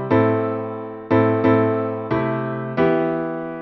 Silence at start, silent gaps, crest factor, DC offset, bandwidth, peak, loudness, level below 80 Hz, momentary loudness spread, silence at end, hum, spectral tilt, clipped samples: 0 s; none; 14 dB; under 0.1%; 5.8 kHz; -4 dBFS; -20 LUFS; -54 dBFS; 10 LU; 0 s; none; -10.5 dB/octave; under 0.1%